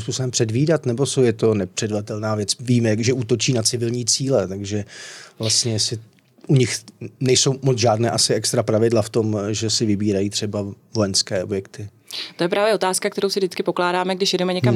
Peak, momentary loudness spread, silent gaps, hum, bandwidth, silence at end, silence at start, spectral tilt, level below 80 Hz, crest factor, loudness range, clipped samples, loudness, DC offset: -6 dBFS; 10 LU; none; none; 15 kHz; 0 s; 0 s; -4.5 dB/octave; -66 dBFS; 16 dB; 3 LU; under 0.1%; -20 LUFS; under 0.1%